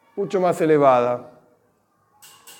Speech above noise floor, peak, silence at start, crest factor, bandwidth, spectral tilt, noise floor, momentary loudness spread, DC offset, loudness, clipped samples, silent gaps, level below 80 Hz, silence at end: 45 dB; -4 dBFS; 0.15 s; 18 dB; 17.5 kHz; -6.5 dB/octave; -64 dBFS; 10 LU; under 0.1%; -19 LUFS; under 0.1%; none; -74 dBFS; 0.1 s